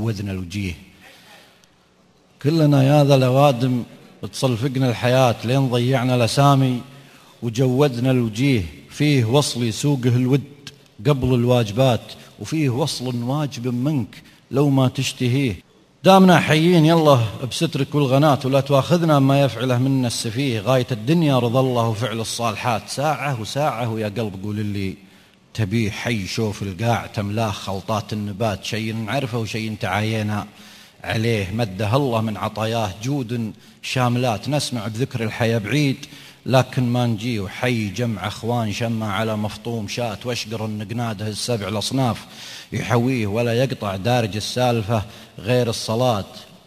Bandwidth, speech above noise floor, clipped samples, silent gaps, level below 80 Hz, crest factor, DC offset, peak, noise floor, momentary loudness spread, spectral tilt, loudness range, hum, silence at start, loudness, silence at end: 14.5 kHz; 36 dB; under 0.1%; none; -48 dBFS; 20 dB; under 0.1%; 0 dBFS; -56 dBFS; 11 LU; -6 dB/octave; 8 LU; none; 0 s; -20 LUFS; 0.2 s